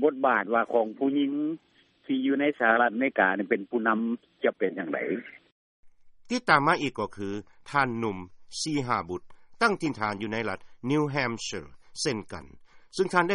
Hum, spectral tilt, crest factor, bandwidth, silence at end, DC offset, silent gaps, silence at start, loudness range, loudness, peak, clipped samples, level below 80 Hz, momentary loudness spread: none; -5 dB/octave; 22 dB; 11 kHz; 0 s; under 0.1%; 5.52-5.83 s; 0 s; 4 LU; -27 LUFS; -6 dBFS; under 0.1%; -64 dBFS; 14 LU